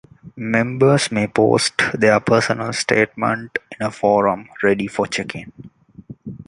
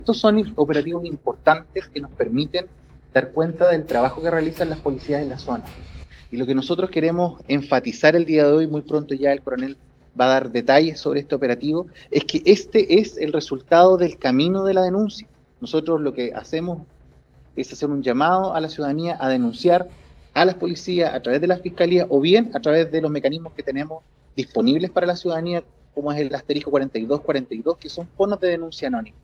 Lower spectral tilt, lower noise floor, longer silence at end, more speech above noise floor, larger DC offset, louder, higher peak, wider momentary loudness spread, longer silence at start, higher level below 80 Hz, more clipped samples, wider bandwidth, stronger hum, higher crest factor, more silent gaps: second, -5 dB/octave vs -6.5 dB/octave; second, -40 dBFS vs -51 dBFS; about the same, 0.05 s vs 0.15 s; second, 22 dB vs 31 dB; neither; first, -18 LUFS vs -21 LUFS; about the same, -2 dBFS vs 0 dBFS; about the same, 12 LU vs 12 LU; first, 0.25 s vs 0 s; about the same, -54 dBFS vs -52 dBFS; neither; first, 11.5 kHz vs 8.2 kHz; neither; about the same, 18 dB vs 20 dB; neither